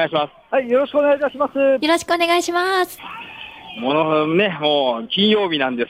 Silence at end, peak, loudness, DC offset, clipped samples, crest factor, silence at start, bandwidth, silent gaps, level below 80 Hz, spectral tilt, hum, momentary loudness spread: 0.05 s; -4 dBFS; -18 LUFS; under 0.1%; under 0.1%; 14 dB; 0 s; 16 kHz; none; -62 dBFS; -4.5 dB/octave; none; 14 LU